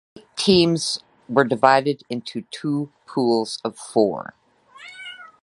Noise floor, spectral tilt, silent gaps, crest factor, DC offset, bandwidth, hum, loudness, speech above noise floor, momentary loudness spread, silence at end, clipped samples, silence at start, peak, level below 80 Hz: -46 dBFS; -5 dB/octave; none; 22 dB; under 0.1%; 11.5 kHz; none; -21 LUFS; 25 dB; 20 LU; 0.15 s; under 0.1%; 0.15 s; 0 dBFS; -58 dBFS